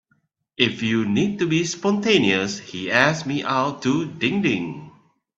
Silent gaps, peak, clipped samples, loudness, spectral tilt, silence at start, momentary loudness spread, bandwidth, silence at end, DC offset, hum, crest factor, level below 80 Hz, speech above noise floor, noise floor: none; 0 dBFS; under 0.1%; -21 LUFS; -4.5 dB/octave; 0.6 s; 8 LU; 7.8 kHz; 0.5 s; under 0.1%; none; 22 dB; -60 dBFS; 46 dB; -67 dBFS